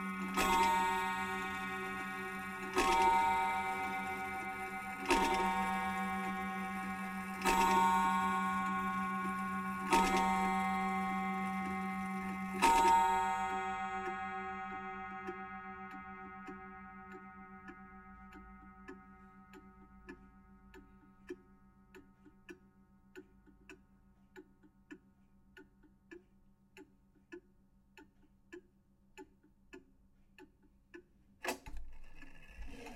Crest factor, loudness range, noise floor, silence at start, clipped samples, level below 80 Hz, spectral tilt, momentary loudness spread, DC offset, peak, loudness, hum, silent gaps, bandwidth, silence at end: 24 dB; 23 LU; -69 dBFS; 0 s; under 0.1%; -58 dBFS; -4 dB/octave; 25 LU; under 0.1%; -16 dBFS; -35 LUFS; none; none; 16 kHz; 0 s